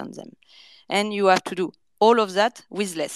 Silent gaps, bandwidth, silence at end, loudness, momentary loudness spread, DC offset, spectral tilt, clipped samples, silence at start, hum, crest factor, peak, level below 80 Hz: none; 13.5 kHz; 0 s; -22 LUFS; 12 LU; under 0.1%; -4 dB/octave; under 0.1%; 0 s; none; 20 dB; -4 dBFS; -76 dBFS